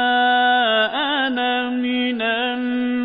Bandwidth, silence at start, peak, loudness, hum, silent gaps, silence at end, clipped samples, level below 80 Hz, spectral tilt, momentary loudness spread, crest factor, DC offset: 5 kHz; 0 s; -8 dBFS; -19 LUFS; none; none; 0 s; under 0.1%; -66 dBFS; -8 dB/octave; 6 LU; 12 dB; under 0.1%